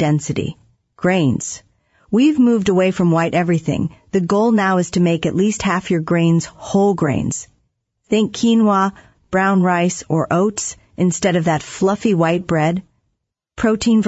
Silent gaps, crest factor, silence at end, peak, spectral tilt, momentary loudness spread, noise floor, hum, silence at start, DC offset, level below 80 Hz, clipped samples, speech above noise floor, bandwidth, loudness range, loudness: none; 14 dB; 0 s; -2 dBFS; -6 dB/octave; 7 LU; -73 dBFS; none; 0 s; under 0.1%; -50 dBFS; under 0.1%; 56 dB; 8 kHz; 2 LU; -17 LUFS